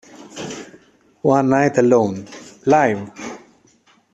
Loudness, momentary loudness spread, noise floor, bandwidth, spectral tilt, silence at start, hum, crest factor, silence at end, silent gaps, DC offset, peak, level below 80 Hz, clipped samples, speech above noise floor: -17 LUFS; 20 LU; -56 dBFS; 8.4 kHz; -6.5 dB/octave; 0.2 s; none; 16 dB; 0.75 s; none; under 0.1%; -2 dBFS; -60 dBFS; under 0.1%; 40 dB